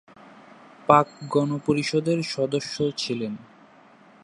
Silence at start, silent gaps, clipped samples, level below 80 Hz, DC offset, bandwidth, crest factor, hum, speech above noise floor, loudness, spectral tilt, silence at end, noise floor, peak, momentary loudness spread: 0.35 s; none; under 0.1%; -64 dBFS; under 0.1%; 11.5 kHz; 24 dB; none; 29 dB; -24 LUFS; -5.5 dB/octave; 0.8 s; -53 dBFS; -2 dBFS; 12 LU